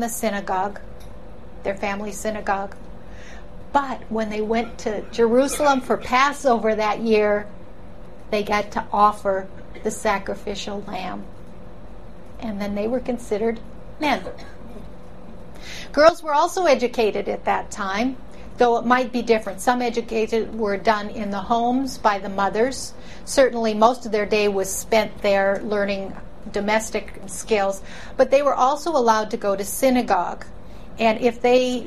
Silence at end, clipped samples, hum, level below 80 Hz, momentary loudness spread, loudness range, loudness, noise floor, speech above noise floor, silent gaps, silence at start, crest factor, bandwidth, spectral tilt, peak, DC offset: 0 s; under 0.1%; none; -44 dBFS; 19 LU; 7 LU; -21 LUFS; -41 dBFS; 20 dB; none; 0 s; 20 dB; 14 kHz; -4 dB/octave; -2 dBFS; 2%